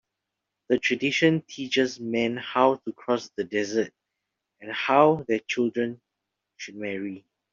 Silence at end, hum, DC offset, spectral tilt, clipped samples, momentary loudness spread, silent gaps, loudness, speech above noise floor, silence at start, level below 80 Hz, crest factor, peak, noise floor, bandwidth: 0.35 s; none; under 0.1%; -5 dB/octave; under 0.1%; 14 LU; none; -25 LUFS; 59 dB; 0.7 s; -70 dBFS; 22 dB; -4 dBFS; -84 dBFS; 7.6 kHz